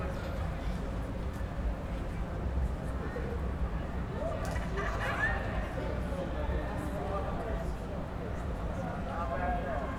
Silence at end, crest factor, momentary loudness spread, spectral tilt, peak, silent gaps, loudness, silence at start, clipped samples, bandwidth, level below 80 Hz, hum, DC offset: 0 s; 14 dB; 5 LU; -7 dB/octave; -20 dBFS; none; -36 LUFS; 0 s; under 0.1%; 13 kHz; -38 dBFS; none; under 0.1%